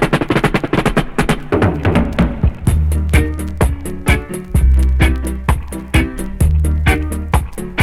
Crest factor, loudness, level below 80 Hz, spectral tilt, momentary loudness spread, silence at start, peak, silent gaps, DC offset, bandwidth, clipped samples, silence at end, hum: 14 dB; -16 LUFS; -18 dBFS; -6.5 dB/octave; 5 LU; 0 s; 0 dBFS; none; under 0.1%; 15 kHz; under 0.1%; 0 s; none